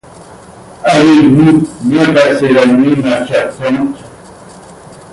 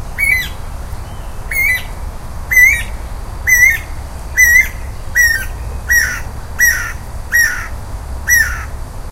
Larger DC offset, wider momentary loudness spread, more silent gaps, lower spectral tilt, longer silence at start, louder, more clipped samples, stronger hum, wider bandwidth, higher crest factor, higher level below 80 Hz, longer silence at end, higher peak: neither; second, 10 LU vs 21 LU; neither; first, -6.5 dB/octave vs -1.5 dB/octave; first, 0.2 s vs 0 s; about the same, -9 LUFS vs -11 LUFS; neither; neither; second, 11.5 kHz vs 16.5 kHz; second, 10 dB vs 16 dB; second, -44 dBFS vs -24 dBFS; first, 0.2 s vs 0 s; about the same, 0 dBFS vs 0 dBFS